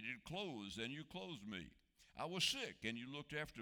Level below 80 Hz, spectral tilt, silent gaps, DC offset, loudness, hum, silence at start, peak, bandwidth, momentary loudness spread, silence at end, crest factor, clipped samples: -72 dBFS; -3 dB/octave; none; under 0.1%; -46 LUFS; none; 0 s; -26 dBFS; over 20 kHz; 12 LU; 0 s; 22 dB; under 0.1%